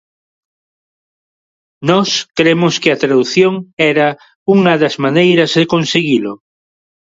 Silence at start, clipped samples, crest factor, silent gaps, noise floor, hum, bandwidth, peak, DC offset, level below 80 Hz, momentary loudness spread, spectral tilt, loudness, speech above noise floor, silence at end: 1.8 s; under 0.1%; 14 dB; 3.73-3.77 s, 4.35-4.46 s; under -90 dBFS; none; 7.8 kHz; 0 dBFS; under 0.1%; -58 dBFS; 5 LU; -5 dB/octave; -12 LUFS; over 78 dB; 0.75 s